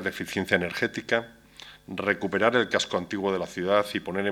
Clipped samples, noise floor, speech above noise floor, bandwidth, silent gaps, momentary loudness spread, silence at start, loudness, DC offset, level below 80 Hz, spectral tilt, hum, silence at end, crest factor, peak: under 0.1%; -49 dBFS; 22 dB; 17 kHz; none; 15 LU; 0 s; -26 LUFS; under 0.1%; -62 dBFS; -4.5 dB/octave; none; 0 s; 22 dB; -4 dBFS